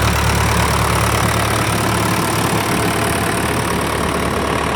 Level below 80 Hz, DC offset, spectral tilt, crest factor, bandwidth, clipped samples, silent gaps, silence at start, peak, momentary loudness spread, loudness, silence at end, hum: -28 dBFS; under 0.1%; -4.5 dB/octave; 14 dB; 17.5 kHz; under 0.1%; none; 0 s; -2 dBFS; 3 LU; -16 LUFS; 0 s; none